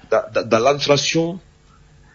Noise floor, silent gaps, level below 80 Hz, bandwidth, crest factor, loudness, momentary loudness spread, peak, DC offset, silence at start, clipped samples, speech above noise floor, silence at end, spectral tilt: -50 dBFS; none; -52 dBFS; 7.4 kHz; 16 dB; -18 LUFS; 9 LU; -2 dBFS; under 0.1%; 0.1 s; under 0.1%; 32 dB; 0.75 s; -4 dB/octave